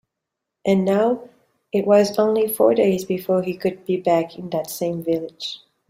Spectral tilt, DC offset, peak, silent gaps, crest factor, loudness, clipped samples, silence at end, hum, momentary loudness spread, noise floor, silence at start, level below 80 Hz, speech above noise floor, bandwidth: -6 dB/octave; under 0.1%; -2 dBFS; none; 18 dB; -20 LUFS; under 0.1%; 0.35 s; none; 11 LU; -82 dBFS; 0.65 s; -64 dBFS; 63 dB; 16 kHz